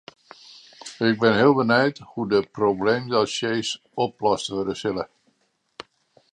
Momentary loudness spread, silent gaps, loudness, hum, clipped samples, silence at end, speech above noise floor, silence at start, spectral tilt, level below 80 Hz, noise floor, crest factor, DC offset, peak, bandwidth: 20 LU; none; -22 LUFS; none; under 0.1%; 1.25 s; 47 dB; 0.85 s; -5 dB/octave; -60 dBFS; -69 dBFS; 20 dB; under 0.1%; -4 dBFS; 10.5 kHz